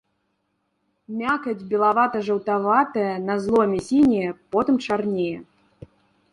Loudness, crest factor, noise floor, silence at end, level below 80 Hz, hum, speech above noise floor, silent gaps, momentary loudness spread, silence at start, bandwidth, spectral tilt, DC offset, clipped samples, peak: -22 LUFS; 18 dB; -73 dBFS; 0.9 s; -58 dBFS; none; 51 dB; none; 7 LU; 1.1 s; 11 kHz; -6.5 dB/octave; under 0.1%; under 0.1%; -4 dBFS